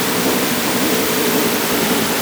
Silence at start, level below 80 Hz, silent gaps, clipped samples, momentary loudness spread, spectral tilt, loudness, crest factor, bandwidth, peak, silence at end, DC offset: 0 s; -48 dBFS; none; under 0.1%; 1 LU; -3 dB/octave; -16 LUFS; 12 dB; over 20 kHz; -4 dBFS; 0 s; under 0.1%